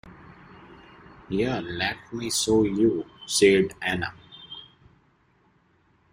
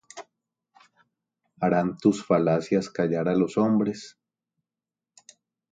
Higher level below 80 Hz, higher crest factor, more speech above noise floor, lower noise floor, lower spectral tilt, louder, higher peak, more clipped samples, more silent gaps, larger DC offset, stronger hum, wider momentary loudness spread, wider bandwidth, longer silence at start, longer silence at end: first, -54 dBFS vs -64 dBFS; about the same, 22 dB vs 20 dB; second, 40 dB vs 66 dB; second, -64 dBFS vs -90 dBFS; second, -4 dB/octave vs -7 dB/octave; about the same, -24 LUFS vs -24 LUFS; first, -4 dBFS vs -8 dBFS; neither; neither; neither; neither; first, 22 LU vs 18 LU; first, 16 kHz vs 9.2 kHz; about the same, 0.05 s vs 0.15 s; about the same, 1.5 s vs 1.6 s